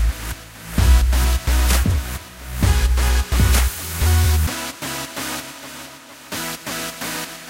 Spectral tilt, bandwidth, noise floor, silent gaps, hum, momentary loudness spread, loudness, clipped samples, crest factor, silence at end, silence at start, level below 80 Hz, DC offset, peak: -4 dB/octave; 16 kHz; -39 dBFS; none; none; 15 LU; -20 LUFS; under 0.1%; 16 dB; 0 s; 0 s; -20 dBFS; under 0.1%; -4 dBFS